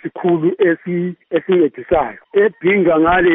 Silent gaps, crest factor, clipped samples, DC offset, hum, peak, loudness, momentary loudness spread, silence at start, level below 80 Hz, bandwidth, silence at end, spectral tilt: none; 12 dB; under 0.1%; under 0.1%; none; -2 dBFS; -16 LUFS; 8 LU; 0.05 s; -44 dBFS; 3.8 kHz; 0 s; -5.5 dB/octave